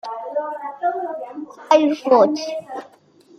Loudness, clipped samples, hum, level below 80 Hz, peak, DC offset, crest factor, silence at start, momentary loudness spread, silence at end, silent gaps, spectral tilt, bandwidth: -20 LUFS; under 0.1%; none; -74 dBFS; -2 dBFS; under 0.1%; 20 dB; 0.05 s; 19 LU; 0.5 s; none; -4.5 dB/octave; 8.2 kHz